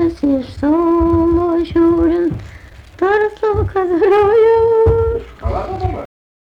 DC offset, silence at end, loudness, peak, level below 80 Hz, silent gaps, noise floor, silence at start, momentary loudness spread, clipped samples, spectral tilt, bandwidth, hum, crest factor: under 0.1%; 0.45 s; -14 LUFS; -4 dBFS; -28 dBFS; none; -37 dBFS; 0 s; 11 LU; under 0.1%; -9 dB/octave; 6 kHz; none; 10 dB